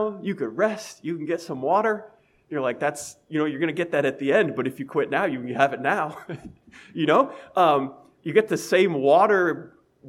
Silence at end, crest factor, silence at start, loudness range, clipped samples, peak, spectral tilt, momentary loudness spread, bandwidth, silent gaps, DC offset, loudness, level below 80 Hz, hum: 0 s; 20 dB; 0 s; 5 LU; under 0.1%; -4 dBFS; -5.5 dB/octave; 13 LU; 15.5 kHz; none; under 0.1%; -23 LUFS; -68 dBFS; none